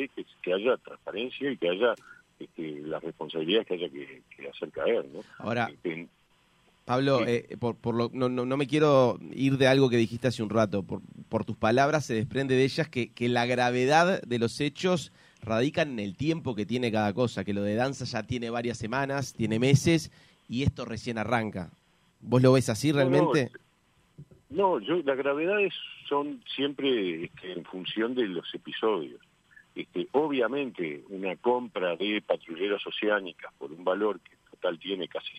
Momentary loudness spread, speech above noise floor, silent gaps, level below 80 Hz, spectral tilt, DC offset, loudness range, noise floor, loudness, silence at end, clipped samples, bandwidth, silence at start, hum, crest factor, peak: 15 LU; 38 dB; none; -60 dBFS; -6 dB/octave; under 0.1%; 6 LU; -66 dBFS; -28 LUFS; 0 s; under 0.1%; 15 kHz; 0 s; none; 20 dB; -8 dBFS